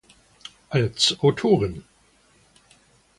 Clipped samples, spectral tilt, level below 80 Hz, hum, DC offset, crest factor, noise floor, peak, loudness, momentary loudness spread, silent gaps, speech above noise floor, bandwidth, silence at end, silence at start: under 0.1%; -4.5 dB/octave; -52 dBFS; none; under 0.1%; 18 dB; -59 dBFS; -6 dBFS; -21 LUFS; 25 LU; none; 38 dB; 11.5 kHz; 1.4 s; 0.7 s